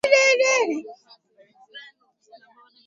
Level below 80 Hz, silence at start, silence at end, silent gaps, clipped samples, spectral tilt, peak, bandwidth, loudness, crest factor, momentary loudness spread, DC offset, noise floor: -72 dBFS; 0.05 s; 1.05 s; none; under 0.1%; 0 dB/octave; -4 dBFS; 11 kHz; -19 LUFS; 20 dB; 27 LU; under 0.1%; -56 dBFS